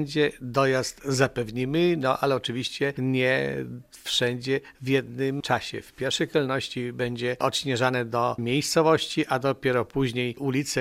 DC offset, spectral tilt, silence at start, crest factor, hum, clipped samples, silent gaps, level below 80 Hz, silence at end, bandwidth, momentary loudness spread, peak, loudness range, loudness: under 0.1%; -4.5 dB/octave; 0 s; 20 dB; none; under 0.1%; none; -58 dBFS; 0 s; 16 kHz; 6 LU; -4 dBFS; 2 LU; -26 LUFS